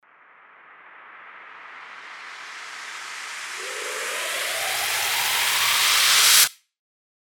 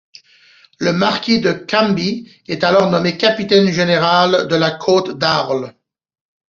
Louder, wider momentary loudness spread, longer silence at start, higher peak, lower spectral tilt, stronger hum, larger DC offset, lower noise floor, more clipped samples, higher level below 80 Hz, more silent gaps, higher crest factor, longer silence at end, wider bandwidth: second, -19 LUFS vs -15 LUFS; first, 25 LU vs 9 LU; about the same, 0.7 s vs 0.8 s; about the same, -2 dBFS vs -2 dBFS; second, 3 dB/octave vs -5.5 dB/octave; neither; neither; about the same, -52 dBFS vs -49 dBFS; neither; second, -68 dBFS vs -56 dBFS; neither; first, 22 dB vs 14 dB; about the same, 0.7 s vs 0.8 s; first, over 20 kHz vs 7.4 kHz